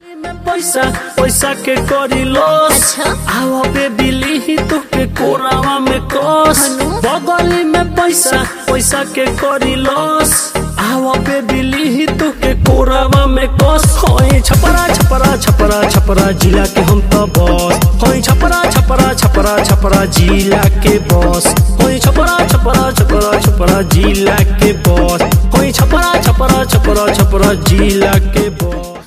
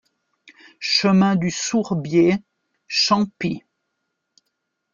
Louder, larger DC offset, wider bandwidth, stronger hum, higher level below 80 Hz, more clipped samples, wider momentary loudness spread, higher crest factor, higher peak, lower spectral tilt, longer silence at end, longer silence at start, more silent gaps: first, -11 LUFS vs -19 LUFS; neither; first, 16 kHz vs 7.4 kHz; neither; first, -16 dBFS vs -60 dBFS; first, 0.1% vs under 0.1%; second, 5 LU vs 11 LU; second, 10 dB vs 18 dB; first, 0 dBFS vs -4 dBFS; about the same, -4.5 dB/octave vs -4.5 dB/octave; second, 0.05 s vs 1.35 s; second, 0.05 s vs 0.8 s; neither